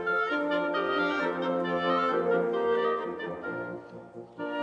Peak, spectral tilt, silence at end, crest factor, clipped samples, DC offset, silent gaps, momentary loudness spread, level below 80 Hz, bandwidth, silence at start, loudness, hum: -14 dBFS; -6.5 dB/octave; 0 s; 14 dB; under 0.1%; under 0.1%; none; 13 LU; -72 dBFS; 7.8 kHz; 0 s; -29 LUFS; none